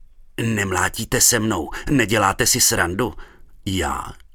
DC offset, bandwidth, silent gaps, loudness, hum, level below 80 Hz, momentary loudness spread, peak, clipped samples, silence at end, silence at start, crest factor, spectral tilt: under 0.1%; 19 kHz; none; -19 LUFS; none; -38 dBFS; 12 LU; 0 dBFS; under 0.1%; 0.2 s; 0.4 s; 20 dB; -3 dB/octave